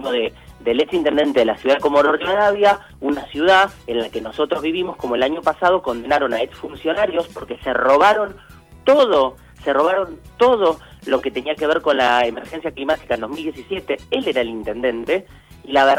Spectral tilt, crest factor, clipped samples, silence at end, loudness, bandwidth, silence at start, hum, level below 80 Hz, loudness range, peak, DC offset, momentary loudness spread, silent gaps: -4.5 dB/octave; 16 dB; under 0.1%; 0 s; -19 LUFS; 15.5 kHz; 0 s; none; -48 dBFS; 4 LU; -2 dBFS; under 0.1%; 12 LU; none